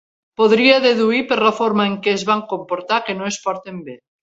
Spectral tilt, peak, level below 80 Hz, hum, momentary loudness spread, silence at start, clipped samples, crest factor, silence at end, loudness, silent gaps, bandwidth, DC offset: -4 dB/octave; 0 dBFS; -62 dBFS; none; 17 LU; 0.4 s; under 0.1%; 18 dB; 0.25 s; -17 LUFS; none; 8 kHz; under 0.1%